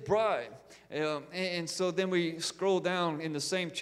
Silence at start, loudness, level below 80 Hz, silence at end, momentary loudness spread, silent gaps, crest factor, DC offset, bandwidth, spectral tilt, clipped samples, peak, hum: 0 s; -32 LUFS; -70 dBFS; 0 s; 6 LU; none; 16 dB; under 0.1%; 14.5 kHz; -4 dB/octave; under 0.1%; -16 dBFS; none